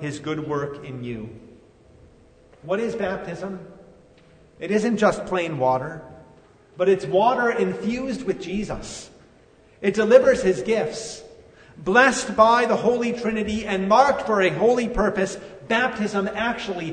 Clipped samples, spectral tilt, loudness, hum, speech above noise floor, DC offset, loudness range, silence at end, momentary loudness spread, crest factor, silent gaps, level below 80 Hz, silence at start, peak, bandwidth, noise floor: under 0.1%; -5 dB/octave; -21 LUFS; none; 32 dB; under 0.1%; 11 LU; 0 s; 17 LU; 22 dB; none; -48 dBFS; 0 s; -2 dBFS; 9.6 kHz; -53 dBFS